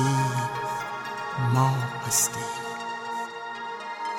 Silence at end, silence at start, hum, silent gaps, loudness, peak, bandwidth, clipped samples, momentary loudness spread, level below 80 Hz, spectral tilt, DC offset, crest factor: 0 s; 0 s; none; none; -27 LUFS; -10 dBFS; 17 kHz; under 0.1%; 12 LU; -62 dBFS; -4 dB/octave; under 0.1%; 18 dB